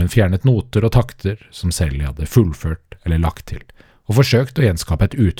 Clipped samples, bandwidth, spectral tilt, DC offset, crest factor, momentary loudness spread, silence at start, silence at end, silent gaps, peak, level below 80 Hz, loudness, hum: under 0.1%; 17 kHz; -6.5 dB/octave; under 0.1%; 16 dB; 11 LU; 0 s; 0.05 s; none; 0 dBFS; -30 dBFS; -18 LUFS; none